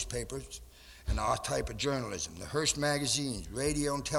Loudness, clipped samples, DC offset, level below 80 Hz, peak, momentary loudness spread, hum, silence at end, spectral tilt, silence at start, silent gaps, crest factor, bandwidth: -33 LUFS; under 0.1%; under 0.1%; -44 dBFS; -16 dBFS; 14 LU; none; 0 s; -3.5 dB/octave; 0 s; none; 18 dB; 17 kHz